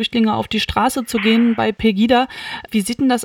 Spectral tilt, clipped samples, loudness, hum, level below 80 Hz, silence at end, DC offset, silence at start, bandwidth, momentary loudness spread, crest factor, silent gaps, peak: -4.5 dB/octave; under 0.1%; -17 LUFS; none; -42 dBFS; 0 s; under 0.1%; 0 s; 16 kHz; 7 LU; 16 dB; none; -2 dBFS